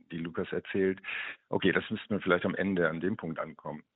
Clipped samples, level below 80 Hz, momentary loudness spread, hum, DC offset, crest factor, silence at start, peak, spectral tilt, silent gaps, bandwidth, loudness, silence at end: under 0.1%; -66 dBFS; 9 LU; none; under 0.1%; 22 dB; 0.1 s; -10 dBFS; -4.5 dB/octave; none; 4.1 kHz; -32 LUFS; 0.15 s